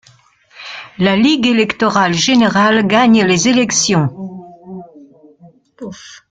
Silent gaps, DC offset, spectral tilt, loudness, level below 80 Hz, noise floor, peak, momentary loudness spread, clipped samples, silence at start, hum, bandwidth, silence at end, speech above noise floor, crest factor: none; under 0.1%; -4 dB/octave; -12 LUFS; -52 dBFS; -49 dBFS; 0 dBFS; 22 LU; under 0.1%; 0.6 s; none; 9.4 kHz; 0.15 s; 37 dB; 14 dB